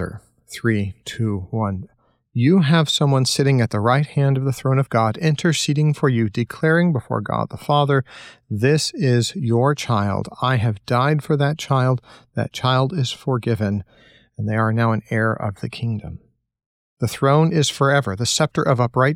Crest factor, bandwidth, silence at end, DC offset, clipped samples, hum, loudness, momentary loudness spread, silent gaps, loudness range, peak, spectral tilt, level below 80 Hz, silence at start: 16 dB; 15.5 kHz; 0 s; under 0.1%; under 0.1%; none; -20 LUFS; 10 LU; 16.66-16.97 s; 4 LU; -4 dBFS; -5.5 dB/octave; -54 dBFS; 0 s